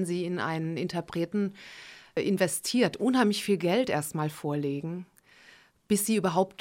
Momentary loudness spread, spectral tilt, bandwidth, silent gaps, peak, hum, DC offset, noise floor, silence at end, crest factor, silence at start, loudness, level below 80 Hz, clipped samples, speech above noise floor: 10 LU; -5 dB/octave; 17 kHz; none; -12 dBFS; none; under 0.1%; -57 dBFS; 0.1 s; 18 dB; 0 s; -29 LUFS; -68 dBFS; under 0.1%; 29 dB